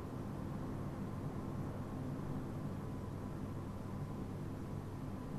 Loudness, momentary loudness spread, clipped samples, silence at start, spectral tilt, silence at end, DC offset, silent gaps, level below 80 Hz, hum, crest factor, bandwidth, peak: -44 LUFS; 2 LU; under 0.1%; 0 s; -8 dB/octave; 0 s; under 0.1%; none; -54 dBFS; none; 12 dB; 13 kHz; -32 dBFS